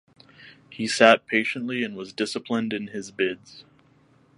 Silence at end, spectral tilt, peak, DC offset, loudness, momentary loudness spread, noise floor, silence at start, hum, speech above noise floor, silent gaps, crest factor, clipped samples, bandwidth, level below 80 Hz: 0.75 s; -3.5 dB/octave; 0 dBFS; under 0.1%; -24 LUFS; 15 LU; -59 dBFS; 0.4 s; none; 35 dB; none; 26 dB; under 0.1%; 11.5 kHz; -70 dBFS